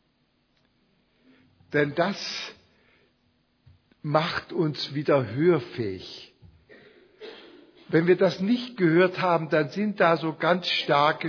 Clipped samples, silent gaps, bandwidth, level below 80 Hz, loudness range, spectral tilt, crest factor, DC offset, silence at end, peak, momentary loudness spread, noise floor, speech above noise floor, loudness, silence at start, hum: under 0.1%; none; 5.4 kHz; -68 dBFS; 9 LU; -6.5 dB/octave; 20 dB; under 0.1%; 0 s; -6 dBFS; 17 LU; -69 dBFS; 45 dB; -24 LUFS; 1.7 s; none